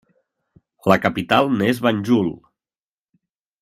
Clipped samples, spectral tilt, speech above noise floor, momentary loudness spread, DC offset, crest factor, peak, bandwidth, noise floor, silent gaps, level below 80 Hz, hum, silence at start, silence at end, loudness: under 0.1%; -6.5 dB/octave; over 72 dB; 4 LU; under 0.1%; 22 dB; 0 dBFS; 15.5 kHz; under -90 dBFS; none; -58 dBFS; none; 0.85 s; 1.25 s; -19 LUFS